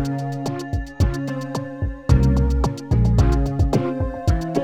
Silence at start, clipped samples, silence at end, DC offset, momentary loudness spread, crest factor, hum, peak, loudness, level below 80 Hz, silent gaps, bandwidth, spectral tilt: 0 s; under 0.1%; 0 s; under 0.1%; 10 LU; 16 dB; none; -4 dBFS; -21 LUFS; -24 dBFS; none; 13 kHz; -7.5 dB/octave